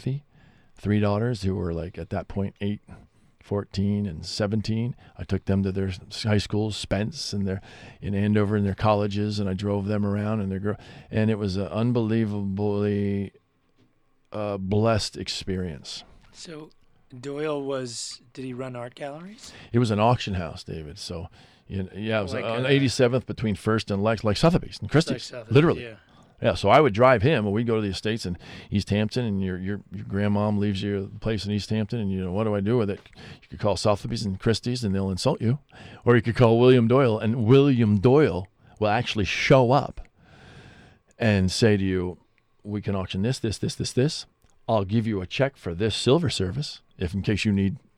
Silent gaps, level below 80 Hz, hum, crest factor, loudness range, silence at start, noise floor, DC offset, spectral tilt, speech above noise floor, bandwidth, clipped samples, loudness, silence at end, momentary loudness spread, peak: none; -48 dBFS; none; 18 dB; 8 LU; 0 s; -63 dBFS; under 0.1%; -6.5 dB/octave; 39 dB; 12 kHz; under 0.1%; -25 LUFS; 0.2 s; 16 LU; -6 dBFS